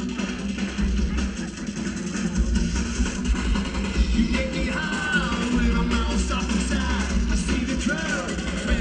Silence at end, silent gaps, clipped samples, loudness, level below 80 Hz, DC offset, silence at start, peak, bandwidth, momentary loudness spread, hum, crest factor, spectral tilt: 0 s; none; under 0.1%; -25 LUFS; -28 dBFS; under 0.1%; 0 s; -8 dBFS; 10 kHz; 5 LU; none; 16 dB; -5 dB/octave